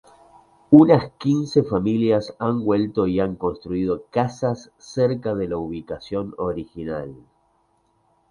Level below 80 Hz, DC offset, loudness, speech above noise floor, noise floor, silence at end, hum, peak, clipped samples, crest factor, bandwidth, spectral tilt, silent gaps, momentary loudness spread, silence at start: -50 dBFS; under 0.1%; -21 LUFS; 44 dB; -64 dBFS; 1.15 s; none; 0 dBFS; under 0.1%; 22 dB; 9.8 kHz; -8 dB/octave; none; 15 LU; 0.7 s